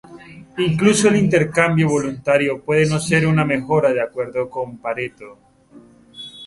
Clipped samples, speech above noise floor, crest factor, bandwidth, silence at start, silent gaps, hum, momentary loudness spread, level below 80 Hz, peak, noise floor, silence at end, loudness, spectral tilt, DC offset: under 0.1%; 29 dB; 18 dB; 11.5 kHz; 0.1 s; none; none; 12 LU; -52 dBFS; -2 dBFS; -47 dBFS; 0 s; -18 LUFS; -5.5 dB/octave; under 0.1%